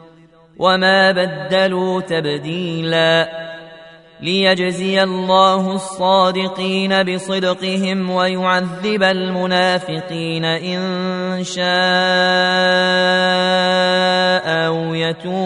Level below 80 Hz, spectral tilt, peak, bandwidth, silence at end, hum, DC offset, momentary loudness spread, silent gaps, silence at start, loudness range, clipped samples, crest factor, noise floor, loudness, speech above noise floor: -60 dBFS; -5 dB/octave; 0 dBFS; 11 kHz; 0 s; none; under 0.1%; 8 LU; none; 0.6 s; 4 LU; under 0.1%; 16 dB; -46 dBFS; -16 LUFS; 30 dB